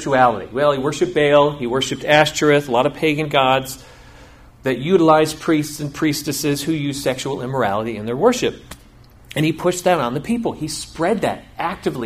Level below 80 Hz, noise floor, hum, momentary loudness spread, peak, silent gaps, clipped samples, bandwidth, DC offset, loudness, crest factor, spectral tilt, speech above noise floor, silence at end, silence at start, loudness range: -48 dBFS; -45 dBFS; none; 10 LU; 0 dBFS; none; under 0.1%; 15.5 kHz; under 0.1%; -18 LUFS; 18 dB; -4.5 dB/octave; 27 dB; 0 s; 0 s; 5 LU